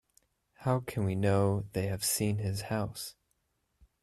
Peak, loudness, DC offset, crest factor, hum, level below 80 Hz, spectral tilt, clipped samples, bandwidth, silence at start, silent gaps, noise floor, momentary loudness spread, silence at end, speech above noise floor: -14 dBFS; -32 LUFS; under 0.1%; 18 dB; none; -60 dBFS; -5 dB/octave; under 0.1%; 14.5 kHz; 0.6 s; none; -78 dBFS; 9 LU; 0.9 s; 47 dB